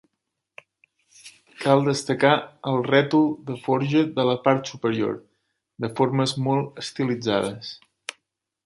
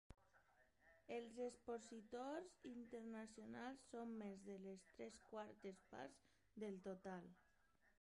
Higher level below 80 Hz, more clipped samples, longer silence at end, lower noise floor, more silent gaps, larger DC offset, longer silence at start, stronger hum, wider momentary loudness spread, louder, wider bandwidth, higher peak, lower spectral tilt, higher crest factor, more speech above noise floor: first, -66 dBFS vs -82 dBFS; neither; first, 0.55 s vs 0.1 s; about the same, -81 dBFS vs -81 dBFS; neither; neither; first, 1.25 s vs 0.1 s; neither; first, 15 LU vs 7 LU; first, -23 LUFS vs -56 LUFS; about the same, 11.5 kHz vs 11 kHz; first, -2 dBFS vs -38 dBFS; about the same, -6 dB/octave vs -5.5 dB/octave; about the same, 22 dB vs 18 dB; first, 59 dB vs 26 dB